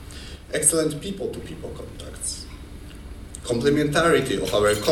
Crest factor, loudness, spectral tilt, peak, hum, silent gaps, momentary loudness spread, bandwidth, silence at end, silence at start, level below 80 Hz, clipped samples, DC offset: 24 dB; -22 LUFS; -3.5 dB/octave; -2 dBFS; none; none; 21 LU; 19 kHz; 0 s; 0 s; -42 dBFS; under 0.1%; under 0.1%